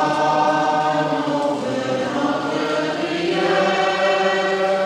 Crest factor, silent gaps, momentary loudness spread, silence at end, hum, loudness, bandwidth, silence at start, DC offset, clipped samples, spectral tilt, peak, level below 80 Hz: 12 dB; none; 5 LU; 0 s; none; -19 LUFS; 11.5 kHz; 0 s; under 0.1%; under 0.1%; -4.5 dB/octave; -6 dBFS; -62 dBFS